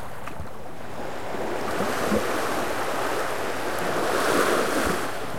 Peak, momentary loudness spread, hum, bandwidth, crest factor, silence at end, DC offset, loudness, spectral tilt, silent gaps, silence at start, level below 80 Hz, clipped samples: -8 dBFS; 15 LU; none; 16.5 kHz; 18 dB; 0 s; 3%; -26 LUFS; -3.5 dB/octave; none; 0 s; -50 dBFS; under 0.1%